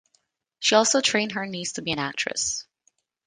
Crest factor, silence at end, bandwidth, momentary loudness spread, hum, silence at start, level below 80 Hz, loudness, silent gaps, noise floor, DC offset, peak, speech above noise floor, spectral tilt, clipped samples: 22 dB; 0.65 s; 10.5 kHz; 11 LU; none; 0.6 s; -64 dBFS; -23 LUFS; none; -70 dBFS; under 0.1%; -4 dBFS; 46 dB; -2 dB/octave; under 0.1%